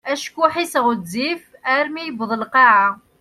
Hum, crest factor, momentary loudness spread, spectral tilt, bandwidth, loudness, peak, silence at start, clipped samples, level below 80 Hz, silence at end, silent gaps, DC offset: none; 18 dB; 12 LU; -3.5 dB/octave; 14.5 kHz; -18 LUFS; 0 dBFS; 0.05 s; under 0.1%; -66 dBFS; 0.25 s; none; under 0.1%